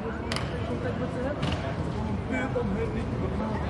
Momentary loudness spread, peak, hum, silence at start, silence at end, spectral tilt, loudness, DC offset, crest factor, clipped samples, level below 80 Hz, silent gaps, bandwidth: 2 LU; -12 dBFS; none; 0 s; 0 s; -7 dB/octave; -30 LUFS; under 0.1%; 18 dB; under 0.1%; -40 dBFS; none; 11.5 kHz